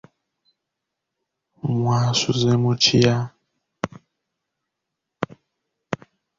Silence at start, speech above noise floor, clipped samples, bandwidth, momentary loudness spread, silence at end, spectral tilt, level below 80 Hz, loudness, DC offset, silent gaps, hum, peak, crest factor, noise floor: 1.65 s; 63 dB; under 0.1%; 7.6 kHz; 17 LU; 0.45 s; -5 dB/octave; -54 dBFS; -21 LUFS; under 0.1%; none; none; -2 dBFS; 22 dB; -82 dBFS